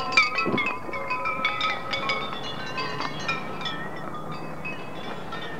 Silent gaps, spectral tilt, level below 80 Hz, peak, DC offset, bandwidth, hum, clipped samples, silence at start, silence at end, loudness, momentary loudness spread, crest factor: none; -4 dB/octave; -58 dBFS; -4 dBFS; 2%; 16 kHz; none; under 0.1%; 0 s; 0 s; -28 LUFS; 12 LU; 24 dB